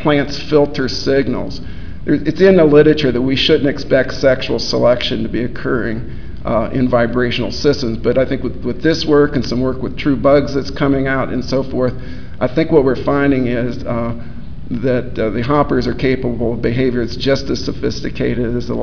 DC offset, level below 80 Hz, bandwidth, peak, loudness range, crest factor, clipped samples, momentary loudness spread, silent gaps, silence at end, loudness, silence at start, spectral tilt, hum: 6%; -32 dBFS; 5.4 kHz; 0 dBFS; 4 LU; 16 dB; under 0.1%; 9 LU; none; 0 s; -16 LUFS; 0 s; -6.5 dB/octave; none